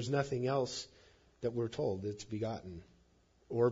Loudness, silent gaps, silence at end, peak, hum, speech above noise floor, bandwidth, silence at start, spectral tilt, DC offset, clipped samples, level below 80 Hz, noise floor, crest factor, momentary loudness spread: -38 LUFS; none; 0 s; -18 dBFS; none; 32 dB; 7.4 kHz; 0 s; -6 dB/octave; under 0.1%; under 0.1%; -68 dBFS; -69 dBFS; 20 dB; 13 LU